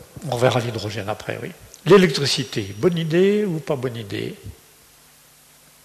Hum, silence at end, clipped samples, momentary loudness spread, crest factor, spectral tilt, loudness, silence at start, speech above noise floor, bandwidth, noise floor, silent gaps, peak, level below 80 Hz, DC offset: none; 1.3 s; under 0.1%; 17 LU; 16 dB; -5.5 dB/octave; -20 LUFS; 0 s; 31 dB; 13.5 kHz; -51 dBFS; none; -6 dBFS; -54 dBFS; under 0.1%